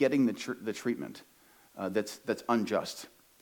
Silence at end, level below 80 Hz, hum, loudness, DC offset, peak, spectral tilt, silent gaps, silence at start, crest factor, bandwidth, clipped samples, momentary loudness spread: 0.35 s; -80 dBFS; none; -33 LUFS; under 0.1%; -14 dBFS; -5 dB/octave; none; 0 s; 18 dB; 19 kHz; under 0.1%; 17 LU